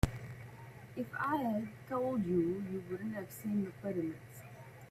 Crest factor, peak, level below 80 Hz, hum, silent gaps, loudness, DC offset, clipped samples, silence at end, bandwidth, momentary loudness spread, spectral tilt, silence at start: 26 dB; -12 dBFS; -52 dBFS; none; none; -38 LUFS; under 0.1%; under 0.1%; 0 s; 15.5 kHz; 18 LU; -7.5 dB/octave; 0.05 s